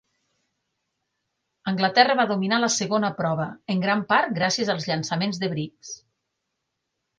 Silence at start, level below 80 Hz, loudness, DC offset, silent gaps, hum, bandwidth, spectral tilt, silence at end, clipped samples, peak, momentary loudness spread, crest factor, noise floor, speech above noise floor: 1.65 s; -68 dBFS; -23 LUFS; under 0.1%; none; none; 10 kHz; -4 dB/octave; 1.25 s; under 0.1%; -2 dBFS; 14 LU; 22 dB; -80 dBFS; 56 dB